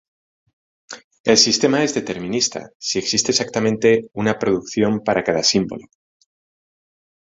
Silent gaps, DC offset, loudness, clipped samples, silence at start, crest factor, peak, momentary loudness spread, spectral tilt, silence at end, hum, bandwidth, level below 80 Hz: 1.04-1.11 s, 1.20-1.24 s, 2.75-2.80 s; under 0.1%; -18 LUFS; under 0.1%; 0.9 s; 20 dB; 0 dBFS; 13 LU; -3 dB/octave; 1.5 s; none; 8 kHz; -56 dBFS